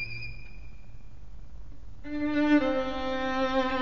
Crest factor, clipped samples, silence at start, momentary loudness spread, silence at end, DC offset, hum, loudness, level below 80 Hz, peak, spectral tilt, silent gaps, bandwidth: 16 dB; under 0.1%; 0 s; 26 LU; 0 s; 1%; none; -28 LUFS; -46 dBFS; -14 dBFS; -6 dB/octave; none; 7 kHz